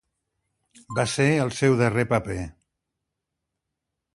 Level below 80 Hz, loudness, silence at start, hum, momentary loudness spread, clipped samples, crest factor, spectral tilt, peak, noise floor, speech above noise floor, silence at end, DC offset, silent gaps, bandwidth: -50 dBFS; -23 LUFS; 0.9 s; none; 12 LU; under 0.1%; 20 dB; -5.5 dB/octave; -6 dBFS; -83 dBFS; 60 dB; 1.65 s; under 0.1%; none; 11.5 kHz